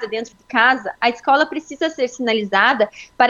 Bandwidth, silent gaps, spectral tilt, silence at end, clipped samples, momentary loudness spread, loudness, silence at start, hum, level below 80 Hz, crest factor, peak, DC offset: 7.8 kHz; none; -3.5 dB/octave; 0 s; under 0.1%; 8 LU; -18 LUFS; 0 s; none; -62 dBFS; 18 dB; 0 dBFS; under 0.1%